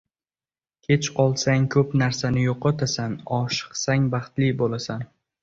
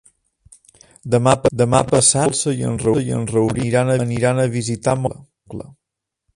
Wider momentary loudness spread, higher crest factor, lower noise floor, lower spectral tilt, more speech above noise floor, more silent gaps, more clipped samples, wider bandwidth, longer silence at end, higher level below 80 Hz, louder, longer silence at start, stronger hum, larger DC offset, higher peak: second, 8 LU vs 15 LU; about the same, 18 dB vs 18 dB; first, under -90 dBFS vs -82 dBFS; about the same, -5.5 dB/octave vs -5 dB/octave; first, over 68 dB vs 64 dB; neither; neither; second, 7.6 kHz vs 11.5 kHz; second, 0.35 s vs 0.75 s; second, -52 dBFS vs -46 dBFS; second, -23 LUFS vs -17 LUFS; second, 0.9 s vs 1.05 s; neither; neither; second, -6 dBFS vs 0 dBFS